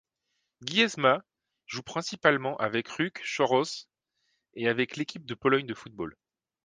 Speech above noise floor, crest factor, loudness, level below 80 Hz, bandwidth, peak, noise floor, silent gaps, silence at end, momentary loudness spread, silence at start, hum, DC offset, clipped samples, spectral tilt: 52 dB; 26 dB; -28 LUFS; -70 dBFS; 10 kHz; -4 dBFS; -80 dBFS; none; 0.5 s; 14 LU; 0.6 s; none; under 0.1%; under 0.1%; -4 dB/octave